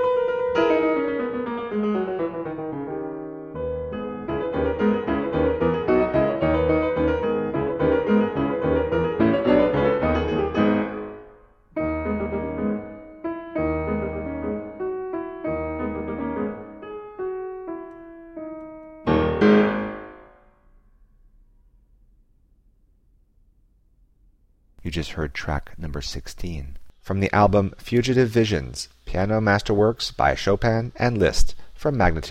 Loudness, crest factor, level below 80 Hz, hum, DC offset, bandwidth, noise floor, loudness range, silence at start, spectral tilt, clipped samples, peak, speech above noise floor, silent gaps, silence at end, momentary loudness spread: -23 LUFS; 18 dB; -36 dBFS; none; under 0.1%; 14.5 kHz; -59 dBFS; 11 LU; 0 s; -6.5 dB/octave; under 0.1%; -4 dBFS; 38 dB; none; 0 s; 15 LU